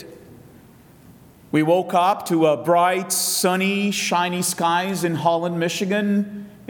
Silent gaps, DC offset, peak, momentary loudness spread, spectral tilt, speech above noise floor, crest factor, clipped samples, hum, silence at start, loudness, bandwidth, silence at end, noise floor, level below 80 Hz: none; under 0.1%; -4 dBFS; 5 LU; -4 dB/octave; 28 dB; 18 dB; under 0.1%; none; 0 s; -20 LUFS; 19 kHz; 0.05 s; -48 dBFS; -64 dBFS